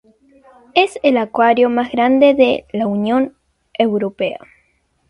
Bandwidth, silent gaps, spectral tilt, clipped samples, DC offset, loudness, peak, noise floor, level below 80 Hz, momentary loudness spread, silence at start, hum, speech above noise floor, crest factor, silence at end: 11.5 kHz; none; -6 dB/octave; under 0.1%; under 0.1%; -15 LUFS; 0 dBFS; -62 dBFS; -56 dBFS; 11 LU; 0.75 s; none; 47 dB; 16 dB; 0.7 s